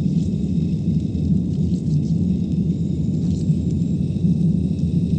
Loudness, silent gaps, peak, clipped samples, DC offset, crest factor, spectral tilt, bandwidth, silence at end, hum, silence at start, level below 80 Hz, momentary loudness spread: -21 LUFS; none; -8 dBFS; under 0.1%; under 0.1%; 12 dB; -10 dB/octave; 8.6 kHz; 0 s; none; 0 s; -34 dBFS; 2 LU